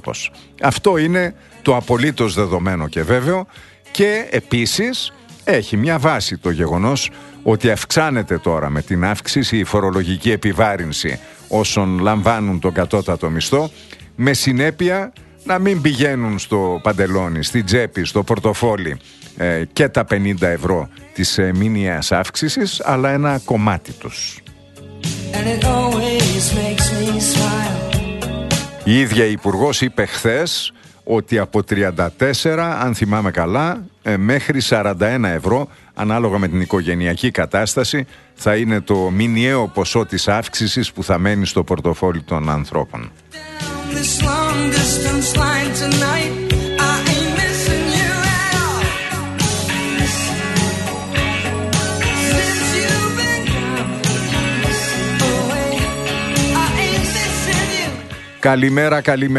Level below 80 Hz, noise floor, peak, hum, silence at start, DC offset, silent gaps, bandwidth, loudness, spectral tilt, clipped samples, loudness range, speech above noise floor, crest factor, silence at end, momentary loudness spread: -34 dBFS; -38 dBFS; 0 dBFS; none; 0.05 s; under 0.1%; none; 12.5 kHz; -17 LUFS; -4.5 dB/octave; under 0.1%; 2 LU; 21 dB; 18 dB; 0 s; 7 LU